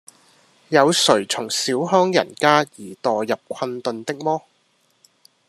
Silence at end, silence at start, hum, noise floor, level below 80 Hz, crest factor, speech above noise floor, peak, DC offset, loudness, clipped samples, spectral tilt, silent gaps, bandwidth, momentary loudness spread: 1.1 s; 0.7 s; none; -63 dBFS; -70 dBFS; 20 dB; 44 dB; 0 dBFS; under 0.1%; -20 LUFS; under 0.1%; -3.5 dB/octave; none; 13.5 kHz; 10 LU